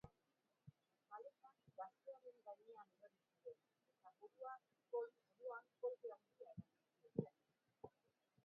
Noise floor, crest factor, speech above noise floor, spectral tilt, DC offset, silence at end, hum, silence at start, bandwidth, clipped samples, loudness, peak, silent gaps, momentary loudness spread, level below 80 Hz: -88 dBFS; 30 dB; 33 dB; -8.5 dB/octave; under 0.1%; 0.55 s; none; 0.05 s; 4.5 kHz; under 0.1%; -56 LUFS; -28 dBFS; none; 15 LU; -88 dBFS